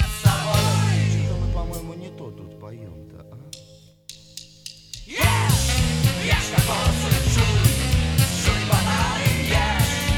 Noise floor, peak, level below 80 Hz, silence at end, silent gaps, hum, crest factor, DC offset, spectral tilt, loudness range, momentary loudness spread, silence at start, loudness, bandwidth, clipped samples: -49 dBFS; -2 dBFS; -30 dBFS; 0 s; none; none; 20 dB; under 0.1%; -4.5 dB/octave; 16 LU; 21 LU; 0 s; -20 LUFS; 19 kHz; under 0.1%